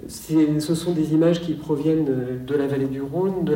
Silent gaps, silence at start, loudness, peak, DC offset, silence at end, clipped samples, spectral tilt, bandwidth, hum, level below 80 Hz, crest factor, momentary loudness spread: none; 0 s; -22 LUFS; -8 dBFS; under 0.1%; 0 s; under 0.1%; -7 dB/octave; 16.5 kHz; none; -52 dBFS; 14 dB; 6 LU